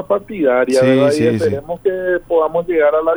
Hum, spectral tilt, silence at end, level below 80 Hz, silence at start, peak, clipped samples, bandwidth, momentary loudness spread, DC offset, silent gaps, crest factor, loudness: none; -6.5 dB/octave; 0 s; -48 dBFS; 0 s; 0 dBFS; under 0.1%; over 20 kHz; 7 LU; under 0.1%; none; 14 dB; -15 LUFS